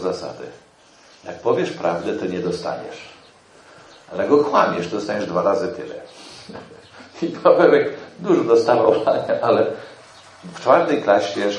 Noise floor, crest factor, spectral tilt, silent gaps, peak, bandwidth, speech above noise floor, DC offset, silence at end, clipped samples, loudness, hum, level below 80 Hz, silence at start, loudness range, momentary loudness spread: -50 dBFS; 20 dB; -6 dB/octave; none; 0 dBFS; 10.5 kHz; 31 dB; under 0.1%; 0 s; under 0.1%; -19 LUFS; none; -66 dBFS; 0 s; 8 LU; 22 LU